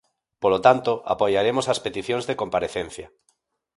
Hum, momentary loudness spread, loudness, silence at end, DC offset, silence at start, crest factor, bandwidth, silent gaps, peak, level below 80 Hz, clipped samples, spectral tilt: none; 11 LU; -22 LUFS; 0.7 s; under 0.1%; 0.4 s; 22 dB; 11.5 kHz; none; -2 dBFS; -56 dBFS; under 0.1%; -4.5 dB/octave